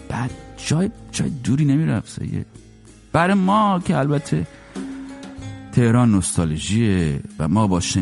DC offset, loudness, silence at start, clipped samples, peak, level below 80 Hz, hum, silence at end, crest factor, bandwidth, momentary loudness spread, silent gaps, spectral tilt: under 0.1%; -20 LUFS; 0 s; under 0.1%; -2 dBFS; -42 dBFS; none; 0 s; 18 dB; 11.5 kHz; 16 LU; none; -6 dB/octave